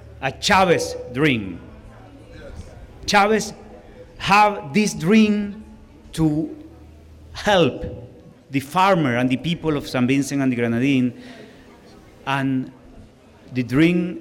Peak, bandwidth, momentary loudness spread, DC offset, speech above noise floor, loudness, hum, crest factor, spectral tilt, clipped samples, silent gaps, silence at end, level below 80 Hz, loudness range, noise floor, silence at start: -6 dBFS; 16.5 kHz; 22 LU; under 0.1%; 27 dB; -20 LUFS; none; 16 dB; -5.5 dB/octave; under 0.1%; none; 0 s; -46 dBFS; 5 LU; -46 dBFS; 0.05 s